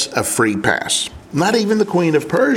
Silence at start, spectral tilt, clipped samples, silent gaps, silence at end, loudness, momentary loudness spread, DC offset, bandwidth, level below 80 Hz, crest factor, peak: 0 s; -4 dB/octave; under 0.1%; none; 0 s; -17 LUFS; 3 LU; under 0.1%; 17.5 kHz; -48 dBFS; 16 dB; 0 dBFS